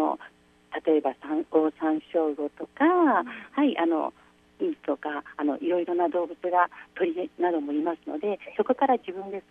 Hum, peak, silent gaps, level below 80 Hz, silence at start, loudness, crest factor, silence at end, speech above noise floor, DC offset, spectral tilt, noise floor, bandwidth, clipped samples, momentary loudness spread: 60 Hz at -70 dBFS; -8 dBFS; none; -72 dBFS; 0 s; -27 LUFS; 18 dB; 0.1 s; 26 dB; under 0.1%; -7 dB/octave; -53 dBFS; 3.9 kHz; under 0.1%; 9 LU